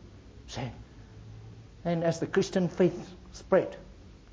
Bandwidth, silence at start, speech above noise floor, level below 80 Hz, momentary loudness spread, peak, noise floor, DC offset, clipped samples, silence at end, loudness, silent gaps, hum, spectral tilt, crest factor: 8 kHz; 0.05 s; 21 dB; -54 dBFS; 23 LU; -10 dBFS; -49 dBFS; under 0.1%; under 0.1%; 0.2 s; -30 LUFS; none; none; -6.5 dB/octave; 22 dB